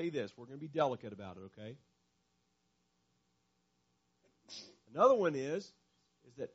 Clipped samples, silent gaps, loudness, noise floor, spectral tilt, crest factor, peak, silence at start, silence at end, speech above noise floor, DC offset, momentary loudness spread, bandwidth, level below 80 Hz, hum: under 0.1%; none; -34 LUFS; -79 dBFS; -5 dB/octave; 24 dB; -16 dBFS; 0 s; 0.05 s; 44 dB; under 0.1%; 22 LU; 7.6 kHz; -82 dBFS; 60 Hz at -80 dBFS